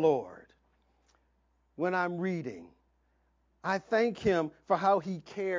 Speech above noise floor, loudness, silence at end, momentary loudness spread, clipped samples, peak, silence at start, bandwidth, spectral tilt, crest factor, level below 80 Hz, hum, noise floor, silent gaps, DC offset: 42 dB; -31 LUFS; 0 s; 12 LU; under 0.1%; -14 dBFS; 0 s; 7.6 kHz; -6.5 dB/octave; 18 dB; -66 dBFS; none; -72 dBFS; none; under 0.1%